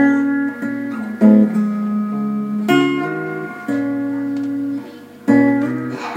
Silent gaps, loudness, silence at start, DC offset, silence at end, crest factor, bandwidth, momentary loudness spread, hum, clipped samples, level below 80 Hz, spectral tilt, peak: none; -18 LUFS; 0 s; under 0.1%; 0 s; 16 dB; 16 kHz; 12 LU; none; under 0.1%; -64 dBFS; -7 dB/octave; 0 dBFS